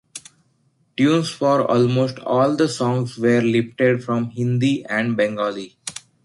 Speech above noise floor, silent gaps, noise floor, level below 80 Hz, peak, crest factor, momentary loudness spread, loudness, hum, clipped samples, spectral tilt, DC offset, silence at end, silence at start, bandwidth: 44 dB; none; -63 dBFS; -60 dBFS; -4 dBFS; 16 dB; 14 LU; -19 LUFS; none; under 0.1%; -6 dB/octave; under 0.1%; 0.25 s; 0.15 s; 11.5 kHz